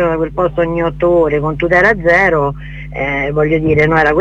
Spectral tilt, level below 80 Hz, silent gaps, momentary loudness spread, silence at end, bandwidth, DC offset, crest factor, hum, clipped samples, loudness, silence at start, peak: -7.5 dB/octave; -30 dBFS; none; 8 LU; 0 s; 8 kHz; under 0.1%; 12 dB; none; under 0.1%; -13 LUFS; 0 s; 0 dBFS